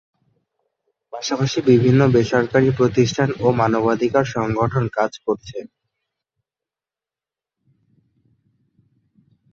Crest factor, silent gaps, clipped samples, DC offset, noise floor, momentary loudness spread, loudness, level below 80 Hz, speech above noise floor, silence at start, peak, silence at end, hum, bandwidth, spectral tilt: 18 dB; none; under 0.1%; under 0.1%; -90 dBFS; 11 LU; -18 LUFS; -52 dBFS; 72 dB; 1.15 s; -2 dBFS; 3.85 s; none; 7.4 kHz; -6.5 dB/octave